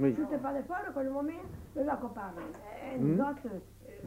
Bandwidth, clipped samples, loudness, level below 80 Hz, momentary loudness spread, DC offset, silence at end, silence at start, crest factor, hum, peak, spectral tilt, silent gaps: 16 kHz; under 0.1%; -35 LUFS; -58 dBFS; 14 LU; under 0.1%; 0 s; 0 s; 18 dB; none; -16 dBFS; -8.5 dB/octave; none